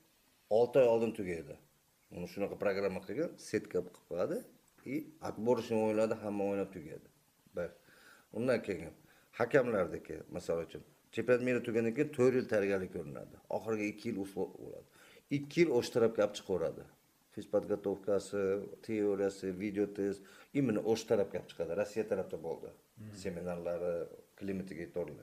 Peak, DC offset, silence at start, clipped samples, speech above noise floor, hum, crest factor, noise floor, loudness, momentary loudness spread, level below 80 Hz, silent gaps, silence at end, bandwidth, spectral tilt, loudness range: -14 dBFS; under 0.1%; 0.5 s; under 0.1%; 35 dB; none; 22 dB; -70 dBFS; -36 LUFS; 16 LU; -70 dBFS; none; 0 s; 15 kHz; -6.5 dB/octave; 5 LU